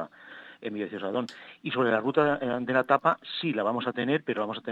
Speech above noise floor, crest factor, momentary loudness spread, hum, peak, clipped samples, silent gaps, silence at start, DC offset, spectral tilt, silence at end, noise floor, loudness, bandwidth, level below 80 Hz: 21 dB; 22 dB; 15 LU; none; -6 dBFS; under 0.1%; none; 0 s; under 0.1%; -7 dB/octave; 0 s; -48 dBFS; -28 LUFS; 8.6 kHz; -70 dBFS